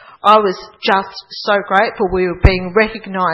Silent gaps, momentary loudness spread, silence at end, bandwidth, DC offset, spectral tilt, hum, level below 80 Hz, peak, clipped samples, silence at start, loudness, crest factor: none; 9 LU; 0 s; 9 kHz; under 0.1%; -7 dB/octave; none; -26 dBFS; 0 dBFS; 0.3%; 0.25 s; -15 LUFS; 14 dB